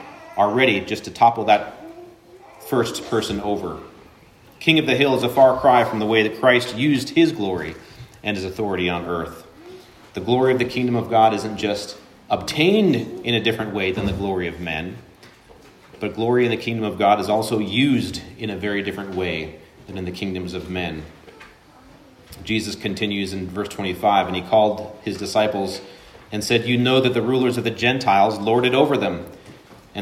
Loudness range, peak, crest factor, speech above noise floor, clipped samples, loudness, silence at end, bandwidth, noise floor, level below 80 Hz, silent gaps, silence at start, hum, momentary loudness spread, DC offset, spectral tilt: 10 LU; -2 dBFS; 20 dB; 29 dB; under 0.1%; -20 LUFS; 0 s; 16 kHz; -49 dBFS; -50 dBFS; none; 0 s; none; 14 LU; under 0.1%; -5.5 dB/octave